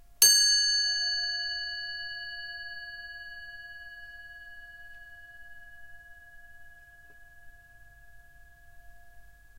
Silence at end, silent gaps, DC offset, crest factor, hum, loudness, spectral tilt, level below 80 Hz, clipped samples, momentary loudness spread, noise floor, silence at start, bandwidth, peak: 0 s; none; under 0.1%; 32 dB; none; -25 LUFS; 4 dB/octave; -60 dBFS; under 0.1%; 29 LU; -53 dBFS; 0 s; 16 kHz; 0 dBFS